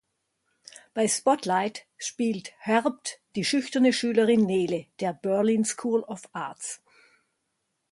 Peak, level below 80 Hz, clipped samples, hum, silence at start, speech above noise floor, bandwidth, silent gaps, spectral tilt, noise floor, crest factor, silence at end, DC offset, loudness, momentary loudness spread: -8 dBFS; -72 dBFS; under 0.1%; none; 0.95 s; 53 dB; 11.5 kHz; none; -4 dB/octave; -78 dBFS; 18 dB; 1.15 s; under 0.1%; -26 LUFS; 14 LU